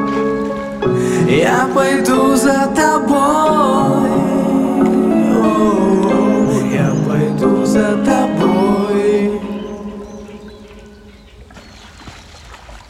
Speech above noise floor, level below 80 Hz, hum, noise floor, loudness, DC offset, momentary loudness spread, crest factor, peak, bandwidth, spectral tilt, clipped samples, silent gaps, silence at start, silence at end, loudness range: 27 dB; -42 dBFS; none; -39 dBFS; -14 LUFS; under 0.1%; 10 LU; 14 dB; 0 dBFS; 15.5 kHz; -6 dB/octave; under 0.1%; none; 0 s; 0.1 s; 9 LU